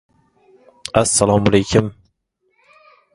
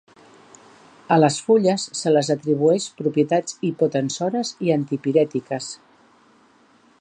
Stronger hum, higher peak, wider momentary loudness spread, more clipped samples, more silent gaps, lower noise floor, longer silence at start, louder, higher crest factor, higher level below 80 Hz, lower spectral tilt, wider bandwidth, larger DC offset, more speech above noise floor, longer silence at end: neither; first, 0 dBFS vs -4 dBFS; first, 12 LU vs 9 LU; neither; neither; first, -67 dBFS vs -56 dBFS; second, 0.95 s vs 1.1 s; first, -16 LUFS vs -21 LUFS; about the same, 20 dB vs 18 dB; first, -42 dBFS vs -70 dBFS; about the same, -4.5 dB/octave vs -5.5 dB/octave; first, 11.5 kHz vs 10 kHz; neither; first, 52 dB vs 36 dB; about the same, 1.25 s vs 1.25 s